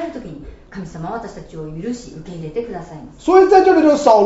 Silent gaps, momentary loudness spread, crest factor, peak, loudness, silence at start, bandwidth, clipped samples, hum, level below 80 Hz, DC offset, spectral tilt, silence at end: none; 23 LU; 16 dB; 0 dBFS; -14 LUFS; 0 s; 8 kHz; under 0.1%; none; -44 dBFS; under 0.1%; -6 dB/octave; 0 s